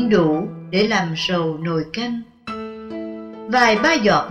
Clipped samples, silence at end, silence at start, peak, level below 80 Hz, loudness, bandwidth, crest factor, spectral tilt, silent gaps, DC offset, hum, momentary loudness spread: under 0.1%; 0 s; 0 s; -4 dBFS; -50 dBFS; -18 LUFS; 9.8 kHz; 14 dB; -5 dB/octave; none; under 0.1%; none; 16 LU